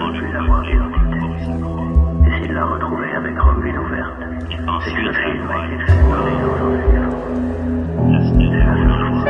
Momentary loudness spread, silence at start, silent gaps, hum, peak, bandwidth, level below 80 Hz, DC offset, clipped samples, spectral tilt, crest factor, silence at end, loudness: 8 LU; 0 s; none; none; 0 dBFS; 5.8 kHz; -20 dBFS; under 0.1%; under 0.1%; -9 dB/octave; 16 dB; 0 s; -18 LUFS